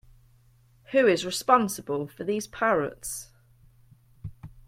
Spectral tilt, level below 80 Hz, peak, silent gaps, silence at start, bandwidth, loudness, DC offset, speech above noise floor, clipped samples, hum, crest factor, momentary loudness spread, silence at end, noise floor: -4 dB/octave; -58 dBFS; -6 dBFS; none; 0.9 s; 16.5 kHz; -26 LUFS; under 0.1%; 34 dB; under 0.1%; none; 22 dB; 22 LU; 0.05 s; -60 dBFS